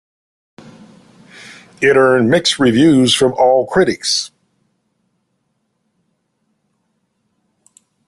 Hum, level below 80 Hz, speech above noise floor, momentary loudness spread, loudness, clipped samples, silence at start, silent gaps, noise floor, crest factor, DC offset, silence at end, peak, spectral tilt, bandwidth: none; -54 dBFS; 56 dB; 9 LU; -12 LUFS; under 0.1%; 1.5 s; none; -67 dBFS; 16 dB; under 0.1%; 3.8 s; 0 dBFS; -4 dB/octave; 12.5 kHz